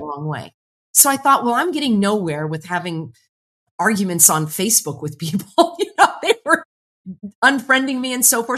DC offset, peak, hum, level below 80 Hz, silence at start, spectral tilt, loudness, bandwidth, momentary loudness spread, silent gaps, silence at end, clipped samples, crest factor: under 0.1%; 0 dBFS; none; -64 dBFS; 0 s; -2.5 dB/octave; -16 LUFS; 13.5 kHz; 16 LU; 0.54-0.94 s, 3.29-3.79 s, 6.65-7.04 s, 7.35-7.42 s; 0 s; under 0.1%; 18 dB